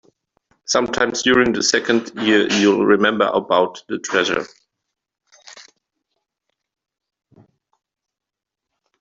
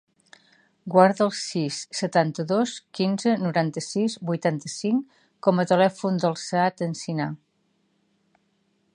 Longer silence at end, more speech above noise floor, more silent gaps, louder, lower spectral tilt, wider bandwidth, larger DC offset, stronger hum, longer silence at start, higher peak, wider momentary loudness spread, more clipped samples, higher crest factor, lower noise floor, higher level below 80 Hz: first, 3.4 s vs 1.6 s; first, 68 dB vs 46 dB; neither; first, -17 LUFS vs -24 LUFS; second, -3 dB/octave vs -5.5 dB/octave; second, 7.8 kHz vs 11 kHz; neither; neither; second, 0.7 s vs 0.85 s; about the same, -2 dBFS vs -2 dBFS; about the same, 8 LU vs 9 LU; neither; about the same, 18 dB vs 22 dB; first, -86 dBFS vs -69 dBFS; first, -58 dBFS vs -74 dBFS